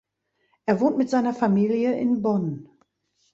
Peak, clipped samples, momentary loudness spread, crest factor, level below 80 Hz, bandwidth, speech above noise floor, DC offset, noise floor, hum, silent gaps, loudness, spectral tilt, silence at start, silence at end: -6 dBFS; under 0.1%; 9 LU; 18 dB; -66 dBFS; 7.8 kHz; 51 dB; under 0.1%; -73 dBFS; none; none; -23 LUFS; -8 dB/octave; 0.65 s; 0.7 s